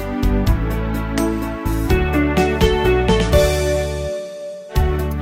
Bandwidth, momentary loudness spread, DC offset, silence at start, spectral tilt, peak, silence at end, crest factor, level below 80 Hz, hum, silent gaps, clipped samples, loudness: 16.5 kHz; 9 LU; under 0.1%; 0 s; -6 dB/octave; -2 dBFS; 0 s; 16 dB; -22 dBFS; none; none; under 0.1%; -18 LUFS